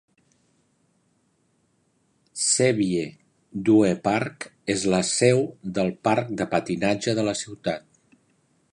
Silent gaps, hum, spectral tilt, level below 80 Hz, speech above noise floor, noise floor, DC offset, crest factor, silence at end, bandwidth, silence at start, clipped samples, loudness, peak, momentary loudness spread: none; none; -4.5 dB/octave; -60 dBFS; 45 dB; -68 dBFS; under 0.1%; 22 dB; 0.95 s; 11 kHz; 2.35 s; under 0.1%; -23 LUFS; -4 dBFS; 12 LU